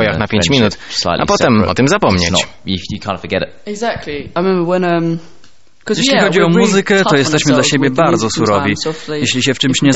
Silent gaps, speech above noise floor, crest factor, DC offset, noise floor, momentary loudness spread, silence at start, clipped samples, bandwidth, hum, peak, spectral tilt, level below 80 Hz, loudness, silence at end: none; 32 dB; 14 dB; 2%; -45 dBFS; 10 LU; 0 s; under 0.1%; 8.2 kHz; none; 0 dBFS; -4.5 dB/octave; -40 dBFS; -13 LUFS; 0 s